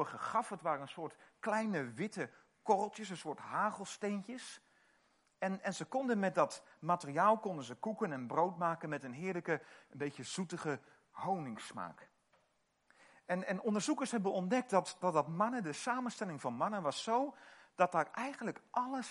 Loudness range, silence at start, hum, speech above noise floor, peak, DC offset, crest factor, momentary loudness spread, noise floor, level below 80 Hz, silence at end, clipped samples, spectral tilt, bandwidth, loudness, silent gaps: 6 LU; 0 s; none; 40 dB; -16 dBFS; under 0.1%; 22 dB; 12 LU; -78 dBFS; -88 dBFS; 0 s; under 0.1%; -5 dB/octave; 11.5 kHz; -38 LUFS; none